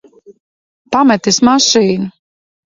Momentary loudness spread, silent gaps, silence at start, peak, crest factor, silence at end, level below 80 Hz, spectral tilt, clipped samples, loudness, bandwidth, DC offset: 10 LU; 0.40-0.85 s; 0.3 s; 0 dBFS; 14 dB; 0.7 s; -52 dBFS; -3.5 dB/octave; under 0.1%; -11 LUFS; 7.8 kHz; under 0.1%